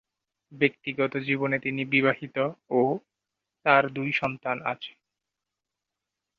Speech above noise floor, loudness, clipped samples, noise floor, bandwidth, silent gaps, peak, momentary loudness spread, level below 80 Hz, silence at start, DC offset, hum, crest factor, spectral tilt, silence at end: 60 dB; -26 LUFS; under 0.1%; -87 dBFS; 6.6 kHz; none; -6 dBFS; 8 LU; -70 dBFS; 0.5 s; under 0.1%; none; 22 dB; -7.5 dB/octave; 1.5 s